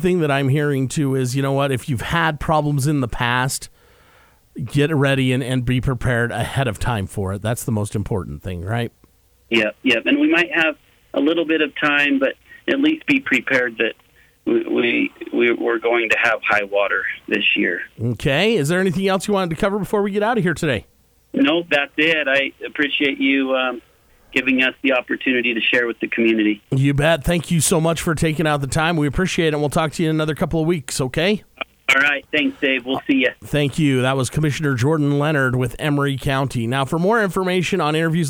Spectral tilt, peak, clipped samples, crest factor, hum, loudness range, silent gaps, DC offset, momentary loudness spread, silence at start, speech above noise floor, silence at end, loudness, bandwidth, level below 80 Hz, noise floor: -5 dB/octave; -4 dBFS; under 0.1%; 16 dB; none; 3 LU; none; under 0.1%; 7 LU; 0 s; 36 dB; 0 s; -19 LUFS; 20 kHz; -42 dBFS; -55 dBFS